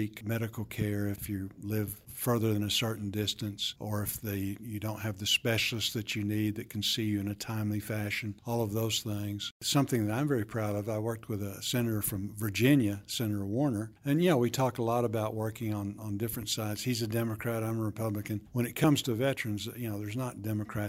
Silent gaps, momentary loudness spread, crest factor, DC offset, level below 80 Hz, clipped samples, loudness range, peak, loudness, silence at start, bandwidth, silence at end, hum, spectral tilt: 9.51-9.60 s; 9 LU; 20 dB; under 0.1%; -62 dBFS; under 0.1%; 3 LU; -12 dBFS; -32 LUFS; 0 s; 16 kHz; 0 s; none; -5 dB/octave